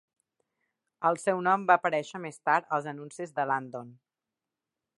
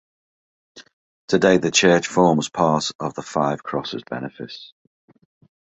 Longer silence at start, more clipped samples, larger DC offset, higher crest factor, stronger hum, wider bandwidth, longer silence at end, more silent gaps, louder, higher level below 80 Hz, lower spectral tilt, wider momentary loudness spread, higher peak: first, 1 s vs 0.75 s; neither; neither; about the same, 24 dB vs 20 dB; neither; first, 11.5 kHz vs 8.2 kHz; about the same, 1.05 s vs 1 s; second, none vs 0.93-1.28 s, 2.95-2.99 s; second, -28 LUFS vs -20 LUFS; second, -84 dBFS vs -58 dBFS; about the same, -5 dB/octave vs -4 dB/octave; about the same, 15 LU vs 16 LU; second, -6 dBFS vs -2 dBFS